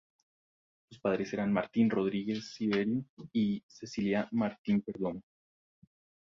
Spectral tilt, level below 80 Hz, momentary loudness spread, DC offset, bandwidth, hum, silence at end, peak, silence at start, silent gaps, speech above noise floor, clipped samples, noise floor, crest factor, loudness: -7 dB/octave; -68 dBFS; 8 LU; under 0.1%; 7.4 kHz; none; 1 s; -14 dBFS; 0.9 s; 3.09-3.17 s, 3.63-3.69 s, 4.58-4.64 s; over 58 dB; under 0.1%; under -90 dBFS; 18 dB; -33 LUFS